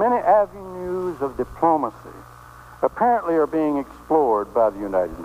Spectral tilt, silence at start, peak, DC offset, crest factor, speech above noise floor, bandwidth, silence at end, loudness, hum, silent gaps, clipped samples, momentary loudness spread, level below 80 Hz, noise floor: -8 dB/octave; 0 s; -6 dBFS; under 0.1%; 16 dB; 22 dB; 15.5 kHz; 0 s; -21 LUFS; none; none; under 0.1%; 10 LU; -48 dBFS; -43 dBFS